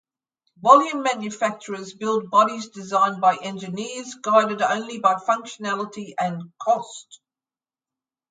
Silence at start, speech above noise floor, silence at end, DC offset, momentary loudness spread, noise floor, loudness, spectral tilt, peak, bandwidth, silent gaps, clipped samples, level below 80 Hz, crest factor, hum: 0.6 s; over 68 dB; 1.15 s; under 0.1%; 14 LU; under -90 dBFS; -22 LUFS; -4 dB/octave; 0 dBFS; 9.4 kHz; none; under 0.1%; -76 dBFS; 22 dB; none